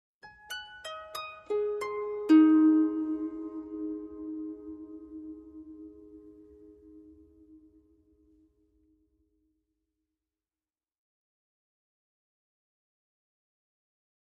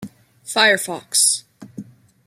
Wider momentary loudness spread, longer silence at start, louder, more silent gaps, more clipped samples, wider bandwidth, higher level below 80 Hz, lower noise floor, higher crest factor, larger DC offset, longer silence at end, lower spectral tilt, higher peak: first, 25 LU vs 19 LU; first, 0.25 s vs 0 s; second, -28 LUFS vs -17 LUFS; neither; neither; second, 11 kHz vs 16 kHz; about the same, -70 dBFS vs -70 dBFS; first, under -90 dBFS vs -39 dBFS; about the same, 22 dB vs 20 dB; neither; first, 7.4 s vs 0.45 s; first, -5 dB/octave vs 0 dB/octave; second, -12 dBFS vs -2 dBFS